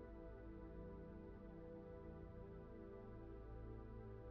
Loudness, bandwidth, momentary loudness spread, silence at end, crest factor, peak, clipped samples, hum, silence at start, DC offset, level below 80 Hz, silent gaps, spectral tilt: -57 LUFS; 5.2 kHz; 1 LU; 0 s; 12 dB; -44 dBFS; under 0.1%; none; 0 s; under 0.1%; -60 dBFS; none; -9 dB/octave